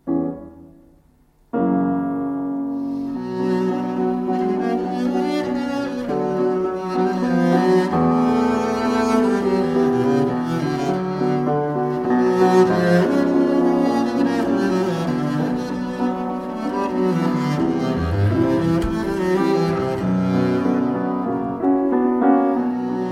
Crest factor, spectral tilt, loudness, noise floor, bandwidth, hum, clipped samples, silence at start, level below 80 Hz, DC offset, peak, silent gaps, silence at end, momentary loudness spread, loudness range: 16 dB; -7.5 dB/octave; -20 LUFS; -55 dBFS; 13 kHz; none; under 0.1%; 0.05 s; -46 dBFS; under 0.1%; -4 dBFS; none; 0 s; 7 LU; 5 LU